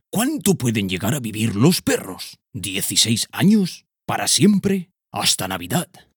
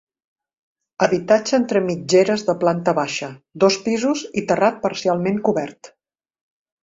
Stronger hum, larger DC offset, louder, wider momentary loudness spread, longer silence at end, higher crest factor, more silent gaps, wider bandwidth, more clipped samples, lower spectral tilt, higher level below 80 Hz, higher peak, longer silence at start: neither; neither; about the same, -19 LUFS vs -19 LUFS; first, 12 LU vs 7 LU; second, 0.3 s vs 0.95 s; about the same, 18 dB vs 18 dB; neither; first, over 20 kHz vs 7.8 kHz; neither; about the same, -4 dB/octave vs -5 dB/octave; about the same, -56 dBFS vs -60 dBFS; about the same, -2 dBFS vs -2 dBFS; second, 0.15 s vs 1 s